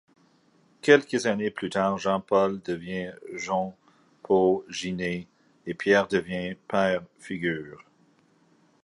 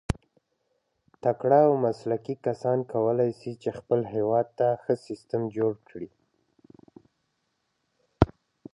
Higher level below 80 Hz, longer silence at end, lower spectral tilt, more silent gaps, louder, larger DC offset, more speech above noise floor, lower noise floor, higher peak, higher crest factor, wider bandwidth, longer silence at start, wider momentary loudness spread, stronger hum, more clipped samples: second, -62 dBFS vs -46 dBFS; first, 1 s vs 0.5 s; second, -5 dB/octave vs -8.5 dB/octave; neither; about the same, -26 LUFS vs -27 LUFS; neither; second, 37 dB vs 51 dB; second, -63 dBFS vs -76 dBFS; second, -4 dBFS vs 0 dBFS; about the same, 24 dB vs 28 dB; about the same, 11.5 kHz vs 11.5 kHz; first, 0.85 s vs 0.1 s; about the same, 15 LU vs 13 LU; neither; neither